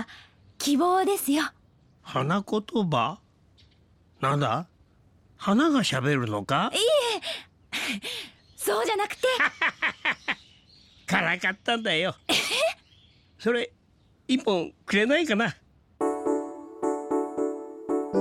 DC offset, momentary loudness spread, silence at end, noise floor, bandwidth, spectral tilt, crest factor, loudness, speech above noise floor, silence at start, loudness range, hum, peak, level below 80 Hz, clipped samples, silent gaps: under 0.1%; 12 LU; 0 s; -62 dBFS; 16 kHz; -4 dB/octave; 20 dB; -26 LUFS; 37 dB; 0 s; 3 LU; none; -8 dBFS; -64 dBFS; under 0.1%; none